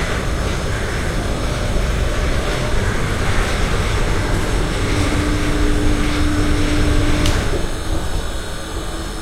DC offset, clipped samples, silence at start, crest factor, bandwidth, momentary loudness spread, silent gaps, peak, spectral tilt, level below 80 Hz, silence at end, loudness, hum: under 0.1%; under 0.1%; 0 s; 14 dB; 15.5 kHz; 6 LU; none; -4 dBFS; -5 dB/octave; -20 dBFS; 0 s; -20 LUFS; none